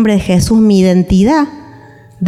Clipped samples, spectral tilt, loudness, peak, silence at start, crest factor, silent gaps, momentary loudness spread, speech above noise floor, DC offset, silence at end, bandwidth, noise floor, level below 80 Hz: under 0.1%; -6.5 dB/octave; -10 LUFS; -2 dBFS; 0 s; 10 dB; none; 5 LU; 28 dB; under 0.1%; 0 s; 13 kHz; -37 dBFS; -30 dBFS